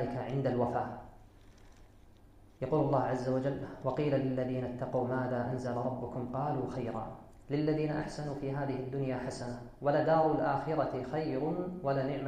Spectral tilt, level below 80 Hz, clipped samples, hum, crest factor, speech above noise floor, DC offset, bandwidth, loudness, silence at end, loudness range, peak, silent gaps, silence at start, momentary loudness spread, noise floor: -8 dB/octave; -56 dBFS; under 0.1%; none; 18 dB; 25 dB; under 0.1%; 9.6 kHz; -34 LUFS; 0 s; 3 LU; -16 dBFS; none; 0 s; 9 LU; -58 dBFS